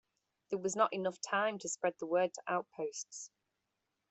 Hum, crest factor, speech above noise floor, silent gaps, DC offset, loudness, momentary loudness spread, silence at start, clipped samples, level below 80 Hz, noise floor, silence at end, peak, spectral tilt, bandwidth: none; 22 dB; 50 dB; none; under 0.1%; -36 LUFS; 11 LU; 0.5 s; under 0.1%; -86 dBFS; -86 dBFS; 0.85 s; -16 dBFS; -3 dB/octave; 8.4 kHz